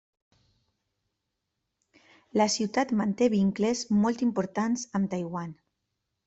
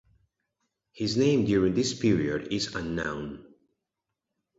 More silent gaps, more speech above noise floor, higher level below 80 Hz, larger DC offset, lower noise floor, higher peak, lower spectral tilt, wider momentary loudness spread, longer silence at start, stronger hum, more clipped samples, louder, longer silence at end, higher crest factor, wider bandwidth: neither; about the same, 56 dB vs 59 dB; second, -66 dBFS vs -54 dBFS; neither; about the same, -83 dBFS vs -86 dBFS; about the same, -12 dBFS vs -12 dBFS; about the same, -5 dB/octave vs -5.5 dB/octave; second, 8 LU vs 11 LU; first, 2.35 s vs 0.95 s; neither; neither; about the same, -27 LUFS vs -27 LUFS; second, 0.75 s vs 1.15 s; about the same, 18 dB vs 18 dB; about the same, 8.2 kHz vs 8 kHz